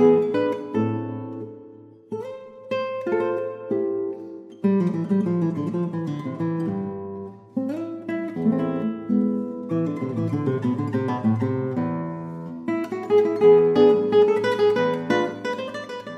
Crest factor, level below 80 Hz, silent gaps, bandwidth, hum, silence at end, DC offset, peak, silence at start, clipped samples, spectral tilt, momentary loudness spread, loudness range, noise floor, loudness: 18 dB; -66 dBFS; none; 8.2 kHz; none; 0 s; under 0.1%; -6 dBFS; 0 s; under 0.1%; -8.5 dB/octave; 16 LU; 9 LU; -46 dBFS; -23 LUFS